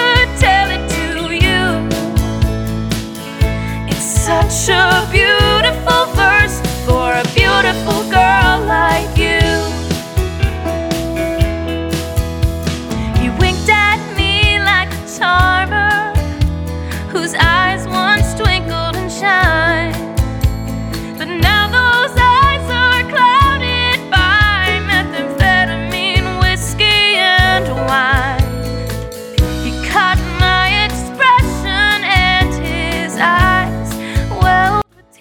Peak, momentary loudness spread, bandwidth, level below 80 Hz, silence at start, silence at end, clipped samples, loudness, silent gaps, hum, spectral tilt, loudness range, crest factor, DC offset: 0 dBFS; 9 LU; 19 kHz; -22 dBFS; 0 s; 0.4 s; under 0.1%; -13 LUFS; none; none; -4 dB/octave; 4 LU; 14 dB; under 0.1%